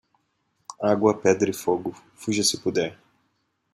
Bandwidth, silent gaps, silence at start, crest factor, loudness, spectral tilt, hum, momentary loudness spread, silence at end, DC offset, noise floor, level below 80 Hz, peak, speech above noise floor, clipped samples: 15.5 kHz; none; 0.7 s; 20 dB; -24 LUFS; -4 dB/octave; none; 13 LU; 0.8 s; under 0.1%; -72 dBFS; -68 dBFS; -4 dBFS; 49 dB; under 0.1%